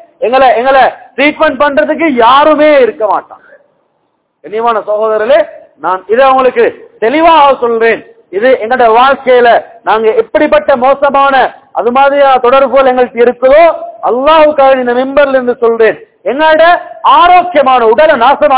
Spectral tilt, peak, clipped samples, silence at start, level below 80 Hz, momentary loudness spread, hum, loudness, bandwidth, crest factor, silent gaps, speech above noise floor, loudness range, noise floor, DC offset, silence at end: -7.5 dB/octave; 0 dBFS; 8%; 0.2 s; -44 dBFS; 8 LU; none; -7 LUFS; 4 kHz; 8 dB; none; 53 dB; 4 LU; -59 dBFS; under 0.1%; 0 s